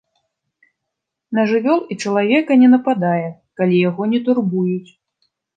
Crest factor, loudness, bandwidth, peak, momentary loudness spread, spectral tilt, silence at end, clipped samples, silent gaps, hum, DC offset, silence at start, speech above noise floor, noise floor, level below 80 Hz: 16 dB; -16 LUFS; 8.8 kHz; -2 dBFS; 10 LU; -7 dB/octave; 0.75 s; under 0.1%; none; none; under 0.1%; 1.3 s; 64 dB; -80 dBFS; -70 dBFS